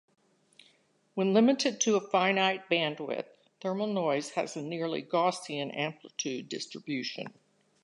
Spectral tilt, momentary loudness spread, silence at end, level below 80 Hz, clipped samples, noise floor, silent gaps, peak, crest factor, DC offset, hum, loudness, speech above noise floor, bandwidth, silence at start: -4 dB/octave; 13 LU; 0.55 s; -84 dBFS; under 0.1%; -68 dBFS; none; -12 dBFS; 20 dB; under 0.1%; none; -30 LUFS; 38 dB; 11 kHz; 1.15 s